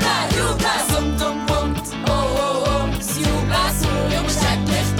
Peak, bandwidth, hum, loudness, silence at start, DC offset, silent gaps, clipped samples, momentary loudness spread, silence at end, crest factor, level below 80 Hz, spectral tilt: -8 dBFS; 19 kHz; none; -20 LUFS; 0 s; under 0.1%; none; under 0.1%; 3 LU; 0 s; 12 dB; -28 dBFS; -4 dB/octave